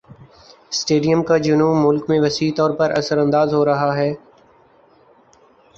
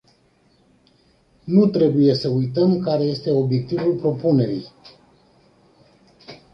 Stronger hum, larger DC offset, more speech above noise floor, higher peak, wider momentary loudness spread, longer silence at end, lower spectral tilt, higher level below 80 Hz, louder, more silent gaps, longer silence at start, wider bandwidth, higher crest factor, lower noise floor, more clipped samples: neither; neither; second, 36 dB vs 41 dB; about the same, -4 dBFS vs -4 dBFS; about the same, 7 LU vs 7 LU; first, 1.6 s vs 0.2 s; second, -5.5 dB/octave vs -9.5 dB/octave; about the same, -56 dBFS vs -58 dBFS; about the same, -17 LUFS vs -19 LUFS; neither; second, 0.1 s vs 1.45 s; first, 7.8 kHz vs 6.4 kHz; about the same, 16 dB vs 18 dB; second, -52 dBFS vs -59 dBFS; neither